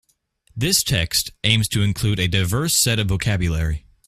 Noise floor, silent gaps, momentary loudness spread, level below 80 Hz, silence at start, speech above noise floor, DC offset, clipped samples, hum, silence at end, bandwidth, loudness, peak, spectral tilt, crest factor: -61 dBFS; none; 7 LU; -36 dBFS; 0.55 s; 41 dB; under 0.1%; under 0.1%; none; 0.3 s; 16 kHz; -19 LUFS; 0 dBFS; -3.5 dB/octave; 20 dB